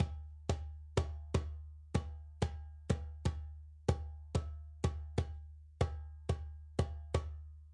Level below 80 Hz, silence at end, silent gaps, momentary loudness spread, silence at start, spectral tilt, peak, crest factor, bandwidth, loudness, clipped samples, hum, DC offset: -46 dBFS; 0 s; none; 10 LU; 0 s; -6.5 dB/octave; -16 dBFS; 24 dB; 11 kHz; -41 LUFS; under 0.1%; none; under 0.1%